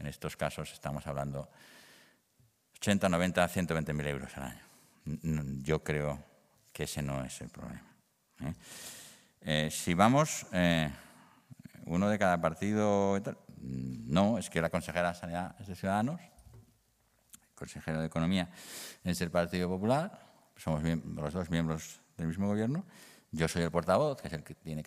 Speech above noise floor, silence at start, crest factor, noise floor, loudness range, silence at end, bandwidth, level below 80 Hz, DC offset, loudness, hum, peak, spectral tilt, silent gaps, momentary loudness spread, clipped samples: 39 dB; 0 s; 26 dB; -72 dBFS; 7 LU; 0 s; 15.5 kHz; -58 dBFS; under 0.1%; -33 LUFS; none; -8 dBFS; -5.5 dB/octave; none; 16 LU; under 0.1%